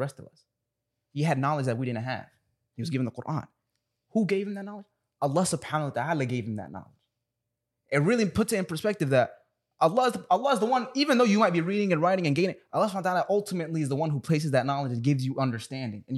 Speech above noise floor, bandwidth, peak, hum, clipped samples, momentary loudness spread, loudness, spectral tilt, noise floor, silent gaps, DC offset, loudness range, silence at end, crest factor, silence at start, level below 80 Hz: 57 dB; 13.5 kHz; -10 dBFS; none; under 0.1%; 12 LU; -27 LUFS; -6 dB/octave; -84 dBFS; none; under 0.1%; 7 LU; 0 s; 18 dB; 0 s; -64 dBFS